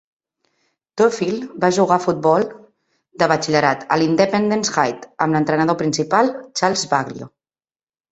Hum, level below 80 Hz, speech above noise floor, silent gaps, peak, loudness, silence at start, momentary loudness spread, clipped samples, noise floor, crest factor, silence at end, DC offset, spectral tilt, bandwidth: none; -60 dBFS; over 72 dB; none; 0 dBFS; -18 LUFS; 0.95 s; 6 LU; under 0.1%; under -90 dBFS; 18 dB; 0.85 s; under 0.1%; -4.5 dB/octave; 8.2 kHz